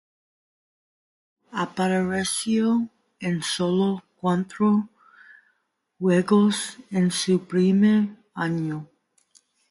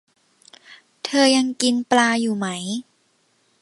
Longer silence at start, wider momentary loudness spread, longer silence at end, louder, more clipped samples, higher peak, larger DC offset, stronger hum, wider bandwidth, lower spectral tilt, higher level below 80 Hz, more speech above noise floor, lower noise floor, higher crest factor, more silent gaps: first, 1.55 s vs 0.7 s; about the same, 11 LU vs 13 LU; about the same, 0.85 s vs 0.8 s; second, -23 LUFS vs -20 LUFS; neither; second, -8 dBFS vs -2 dBFS; neither; neither; about the same, 11.5 kHz vs 11.5 kHz; first, -5.5 dB/octave vs -3 dB/octave; first, -64 dBFS vs -72 dBFS; first, 51 dB vs 45 dB; first, -73 dBFS vs -64 dBFS; about the same, 16 dB vs 20 dB; neither